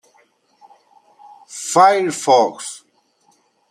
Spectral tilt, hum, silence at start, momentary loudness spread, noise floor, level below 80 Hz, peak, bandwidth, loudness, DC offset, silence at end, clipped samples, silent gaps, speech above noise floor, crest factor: -3 dB/octave; none; 1.5 s; 20 LU; -60 dBFS; -74 dBFS; -2 dBFS; 15.5 kHz; -15 LUFS; under 0.1%; 0.95 s; under 0.1%; none; 45 dB; 18 dB